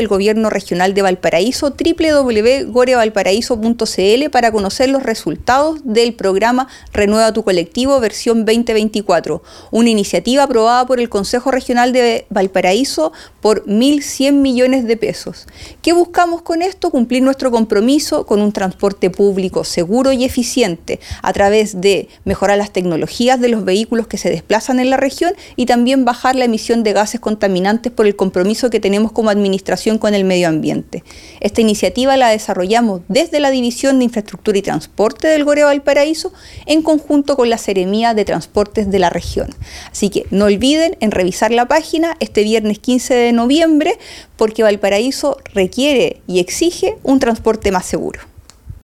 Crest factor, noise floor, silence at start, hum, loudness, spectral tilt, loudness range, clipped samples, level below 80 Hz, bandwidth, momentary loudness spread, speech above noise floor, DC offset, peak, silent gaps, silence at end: 14 dB; -35 dBFS; 0 s; none; -14 LUFS; -4.5 dB/octave; 2 LU; under 0.1%; -40 dBFS; 15.5 kHz; 6 LU; 22 dB; under 0.1%; 0 dBFS; none; 0.15 s